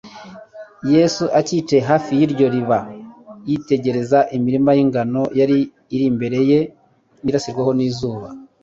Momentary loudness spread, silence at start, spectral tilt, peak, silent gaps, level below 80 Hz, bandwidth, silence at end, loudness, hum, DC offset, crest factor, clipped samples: 17 LU; 0.05 s; -6.5 dB/octave; -2 dBFS; none; -54 dBFS; 7.8 kHz; 0.2 s; -18 LUFS; none; under 0.1%; 16 dB; under 0.1%